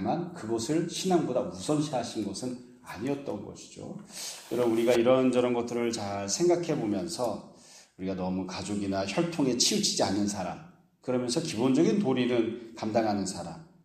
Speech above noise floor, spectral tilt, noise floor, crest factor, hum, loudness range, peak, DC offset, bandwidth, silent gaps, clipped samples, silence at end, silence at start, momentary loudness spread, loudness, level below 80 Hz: 25 dB; -4.5 dB/octave; -54 dBFS; 18 dB; none; 5 LU; -10 dBFS; under 0.1%; 15.5 kHz; none; under 0.1%; 0.2 s; 0 s; 15 LU; -29 LUFS; -66 dBFS